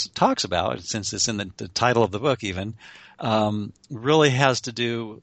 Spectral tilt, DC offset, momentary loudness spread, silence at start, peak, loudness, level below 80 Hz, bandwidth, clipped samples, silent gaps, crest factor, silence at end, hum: -4 dB/octave; under 0.1%; 13 LU; 0 s; -2 dBFS; -23 LUFS; -56 dBFS; 9 kHz; under 0.1%; none; 22 dB; 0.05 s; none